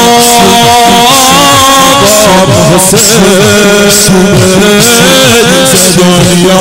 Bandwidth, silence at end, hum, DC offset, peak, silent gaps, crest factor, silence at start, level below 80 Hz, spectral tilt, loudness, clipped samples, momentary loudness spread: 16.5 kHz; 0 s; none; under 0.1%; 0 dBFS; none; 4 dB; 0 s; -28 dBFS; -3 dB/octave; -2 LUFS; 2%; 2 LU